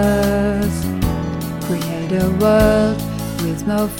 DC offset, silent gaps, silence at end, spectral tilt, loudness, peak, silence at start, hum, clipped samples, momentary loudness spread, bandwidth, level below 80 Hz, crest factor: 0.2%; none; 0 s; -6.5 dB/octave; -18 LUFS; -2 dBFS; 0 s; none; under 0.1%; 10 LU; 17.5 kHz; -30 dBFS; 14 dB